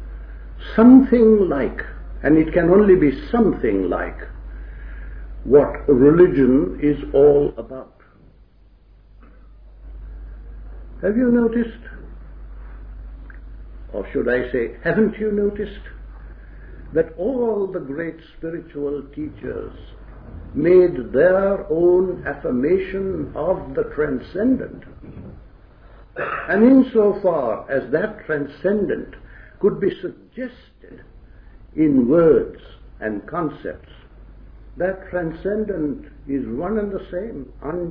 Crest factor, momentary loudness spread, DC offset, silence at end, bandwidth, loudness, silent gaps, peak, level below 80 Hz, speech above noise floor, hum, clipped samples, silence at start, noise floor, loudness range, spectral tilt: 18 dB; 25 LU; under 0.1%; 0 s; 5 kHz; -19 LUFS; none; 0 dBFS; -38 dBFS; 32 dB; none; under 0.1%; 0 s; -50 dBFS; 10 LU; -11.5 dB/octave